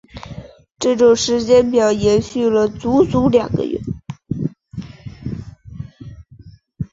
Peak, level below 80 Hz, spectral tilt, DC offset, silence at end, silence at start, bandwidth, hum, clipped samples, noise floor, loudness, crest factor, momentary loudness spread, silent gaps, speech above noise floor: -2 dBFS; -42 dBFS; -5.5 dB/octave; under 0.1%; 0.1 s; 0.15 s; 7.8 kHz; none; under 0.1%; -43 dBFS; -16 LUFS; 16 dB; 21 LU; none; 28 dB